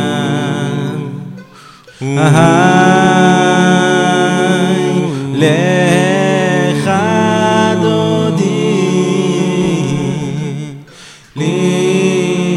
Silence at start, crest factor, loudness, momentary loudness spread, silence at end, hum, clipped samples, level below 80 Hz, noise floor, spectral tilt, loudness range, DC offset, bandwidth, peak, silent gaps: 0 s; 12 dB; -12 LUFS; 11 LU; 0 s; none; under 0.1%; -50 dBFS; -38 dBFS; -5.5 dB/octave; 5 LU; under 0.1%; 12.5 kHz; 0 dBFS; none